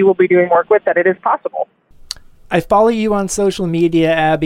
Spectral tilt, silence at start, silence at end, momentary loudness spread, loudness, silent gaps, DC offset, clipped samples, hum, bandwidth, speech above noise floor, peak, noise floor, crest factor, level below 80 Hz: -5.5 dB/octave; 0 s; 0 s; 15 LU; -14 LUFS; none; under 0.1%; under 0.1%; none; 15.5 kHz; 20 dB; -2 dBFS; -33 dBFS; 12 dB; -42 dBFS